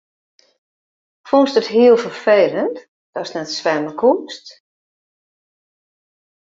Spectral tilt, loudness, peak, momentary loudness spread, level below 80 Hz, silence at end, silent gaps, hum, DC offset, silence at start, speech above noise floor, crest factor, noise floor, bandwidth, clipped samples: -4.5 dB/octave; -16 LUFS; -2 dBFS; 18 LU; -68 dBFS; 2 s; 2.88-3.13 s; none; under 0.1%; 1.25 s; over 74 dB; 18 dB; under -90 dBFS; 7.6 kHz; under 0.1%